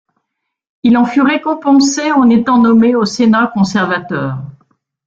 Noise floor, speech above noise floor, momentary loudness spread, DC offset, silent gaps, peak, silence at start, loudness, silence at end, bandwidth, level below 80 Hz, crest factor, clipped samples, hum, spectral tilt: -74 dBFS; 63 dB; 8 LU; under 0.1%; none; -2 dBFS; 0.85 s; -12 LUFS; 0.55 s; 7.8 kHz; -52 dBFS; 10 dB; under 0.1%; none; -5 dB/octave